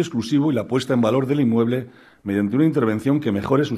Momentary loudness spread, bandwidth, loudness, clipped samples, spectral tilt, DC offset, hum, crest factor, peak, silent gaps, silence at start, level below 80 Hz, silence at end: 6 LU; 13.5 kHz; -20 LUFS; under 0.1%; -7.5 dB/octave; under 0.1%; none; 14 dB; -6 dBFS; none; 0 s; -56 dBFS; 0 s